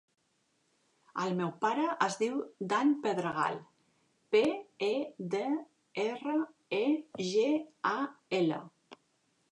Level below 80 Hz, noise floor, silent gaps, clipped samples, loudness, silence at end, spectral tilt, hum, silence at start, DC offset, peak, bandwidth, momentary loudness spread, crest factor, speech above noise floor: -82 dBFS; -75 dBFS; none; under 0.1%; -33 LUFS; 0.6 s; -5.5 dB/octave; none; 1.15 s; under 0.1%; -14 dBFS; 11 kHz; 7 LU; 20 dB; 44 dB